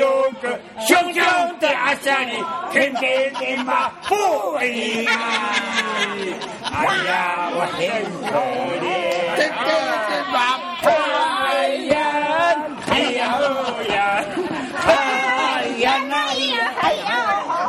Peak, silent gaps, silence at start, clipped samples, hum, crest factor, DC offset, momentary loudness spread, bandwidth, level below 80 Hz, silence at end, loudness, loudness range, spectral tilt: 0 dBFS; none; 0 s; under 0.1%; none; 20 dB; under 0.1%; 6 LU; 13.5 kHz; -56 dBFS; 0 s; -19 LUFS; 2 LU; -3 dB/octave